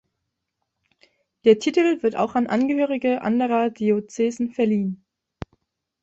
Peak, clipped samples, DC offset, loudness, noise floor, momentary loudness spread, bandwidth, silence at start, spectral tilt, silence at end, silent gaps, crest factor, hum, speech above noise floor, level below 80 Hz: -4 dBFS; under 0.1%; under 0.1%; -21 LUFS; -79 dBFS; 19 LU; 8.2 kHz; 1.45 s; -6 dB/octave; 1.1 s; none; 20 dB; none; 59 dB; -60 dBFS